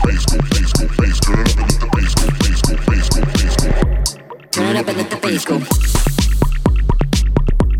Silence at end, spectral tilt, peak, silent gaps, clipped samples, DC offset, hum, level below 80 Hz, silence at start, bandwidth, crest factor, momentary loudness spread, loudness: 0 s; -5 dB/octave; 0 dBFS; none; under 0.1%; under 0.1%; none; -16 dBFS; 0 s; 16.5 kHz; 12 dB; 3 LU; -16 LUFS